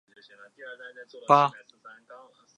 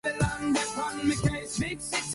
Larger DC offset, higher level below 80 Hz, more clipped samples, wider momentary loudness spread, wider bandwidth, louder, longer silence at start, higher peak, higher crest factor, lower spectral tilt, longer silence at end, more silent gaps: neither; second, -86 dBFS vs -46 dBFS; neither; first, 24 LU vs 4 LU; second, 9.8 kHz vs 11.5 kHz; first, -22 LUFS vs -29 LUFS; first, 0.6 s vs 0.05 s; first, -4 dBFS vs -12 dBFS; first, 26 dB vs 18 dB; first, -5.5 dB/octave vs -4 dB/octave; first, 1.05 s vs 0 s; neither